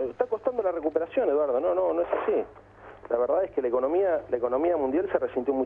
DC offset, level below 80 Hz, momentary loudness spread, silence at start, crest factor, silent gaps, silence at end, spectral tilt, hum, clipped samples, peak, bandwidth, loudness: under 0.1%; -60 dBFS; 4 LU; 0 s; 16 dB; none; 0 s; -8.5 dB/octave; none; under 0.1%; -10 dBFS; 3.7 kHz; -26 LUFS